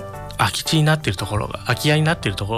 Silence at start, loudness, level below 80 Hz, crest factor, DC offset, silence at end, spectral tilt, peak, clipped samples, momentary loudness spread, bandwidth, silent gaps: 0 s; -20 LUFS; -40 dBFS; 14 dB; under 0.1%; 0 s; -5 dB/octave; -6 dBFS; under 0.1%; 7 LU; 15 kHz; none